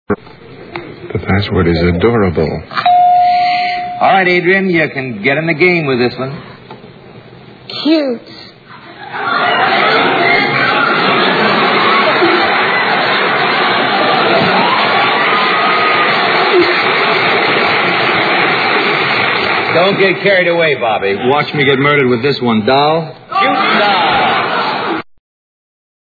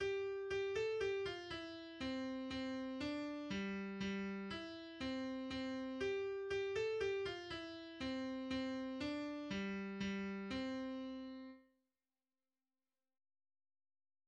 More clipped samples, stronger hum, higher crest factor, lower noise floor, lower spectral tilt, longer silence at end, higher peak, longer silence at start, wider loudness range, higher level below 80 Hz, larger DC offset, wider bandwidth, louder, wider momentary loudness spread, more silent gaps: neither; neither; about the same, 12 dB vs 14 dB; second, -36 dBFS vs under -90 dBFS; first, -7 dB/octave vs -5.5 dB/octave; second, 1.1 s vs 2.65 s; first, 0 dBFS vs -30 dBFS; about the same, 0.1 s vs 0 s; about the same, 5 LU vs 6 LU; first, -42 dBFS vs -68 dBFS; neither; second, 4.9 kHz vs 9.6 kHz; first, -11 LUFS vs -44 LUFS; about the same, 7 LU vs 8 LU; neither